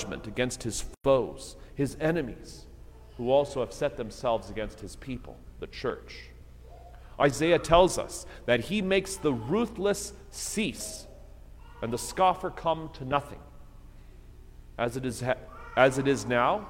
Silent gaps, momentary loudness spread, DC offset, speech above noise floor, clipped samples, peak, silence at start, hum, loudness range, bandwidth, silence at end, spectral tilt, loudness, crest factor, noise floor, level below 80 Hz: none; 19 LU; under 0.1%; 20 dB; under 0.1%; -6 dBFS; 0 s; none; 7 LU; 16.5 kHz; 0 s; -4.5 dB/octave; -29 LUFS; 24 dB; -48 dBFS; -46 dBFS